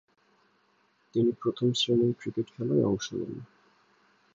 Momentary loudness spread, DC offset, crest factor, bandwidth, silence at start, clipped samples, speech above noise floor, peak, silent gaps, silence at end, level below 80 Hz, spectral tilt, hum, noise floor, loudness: 11 LU; under 0.1%; 16 dB; 7.8 kHz; 1.15 s; under 0.1%; 41 dB; -14 dBFS; none; 0.9 s; -66 dBFS; -6 dB/octave; none; -68 dBFS; -29 LUFS